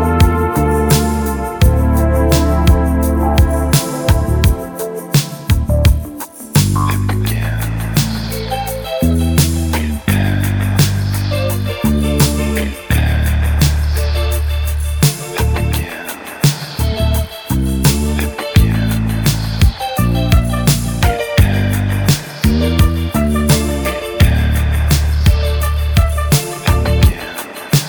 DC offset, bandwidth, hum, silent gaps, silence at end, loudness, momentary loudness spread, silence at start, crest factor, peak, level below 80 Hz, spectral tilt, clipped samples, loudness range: under 0.1%; over 20 kHz; none; none; 0 s; -15 LUFS; 6 LU; 0 s; 14 dB; 0 dBFS; -18 dBFS; -5.5 dB/octave; under 0.1%; 3 LU